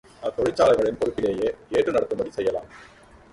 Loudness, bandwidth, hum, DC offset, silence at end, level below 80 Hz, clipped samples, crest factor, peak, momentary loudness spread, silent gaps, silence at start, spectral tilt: -24 LUFS; 11.5 kHz; none; under 0.1%; 0.5 s; -52 dBFS; under 0.1%; 18 dB; -6 dBFS; 9 LU; none; 0.2 s; -5.5 dB/octave